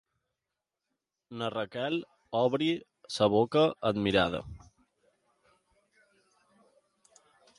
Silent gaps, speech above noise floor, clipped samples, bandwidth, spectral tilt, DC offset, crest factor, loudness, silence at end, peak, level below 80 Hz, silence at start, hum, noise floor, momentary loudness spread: none; 59 dB; under 0.1%; 11.5 kHz; -6 dB/octave; under 0.1%; 22 dB; -30 LUFS; 3 s; -10 dBFS; -60 dBFS; 1.3 s; none; -88 dBFS; 13 LU